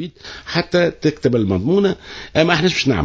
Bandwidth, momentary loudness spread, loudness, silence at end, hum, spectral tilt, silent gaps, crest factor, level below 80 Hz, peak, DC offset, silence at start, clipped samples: 7.8 kHz; 10 LU; -17 LUFS; 0 s; none; -5.5 dB/octave; none; 18 dB; -40 dBFS; 0 dBFS; under 0.1%; 0 s; under 0.1%